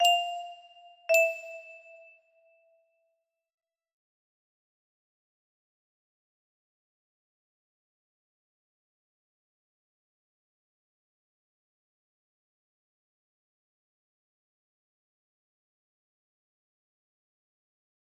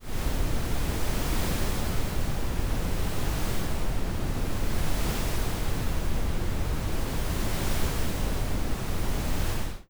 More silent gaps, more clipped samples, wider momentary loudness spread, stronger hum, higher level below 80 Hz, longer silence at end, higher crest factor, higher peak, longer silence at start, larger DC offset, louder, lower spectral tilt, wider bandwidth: neither; neither; first, 25 LU vs 2 LU; neither; second, under -90 dBFS vs -30 dBFS; first, 16.3 s vs 0.1 s; first, 28 dB vs 12 dB; about the same, -12 dBFS vs -14 dBFS; about the same, 0 s vs 0 s; neither; first, -27 LUFS vs -31 LUFS; second, 3 dB/octave vs -5 dB/octave; second, 13 kHz vs over 20 kHz